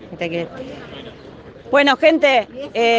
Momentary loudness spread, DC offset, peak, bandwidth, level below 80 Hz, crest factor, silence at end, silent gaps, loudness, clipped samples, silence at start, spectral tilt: 22 LU; under 0.1%; 0 dBFS; 8.8 kHz; -54 dBFS; 18 dB; 0 s; none; -16 LUFS; under 0.1%; 0 s; -4.5 dB/octave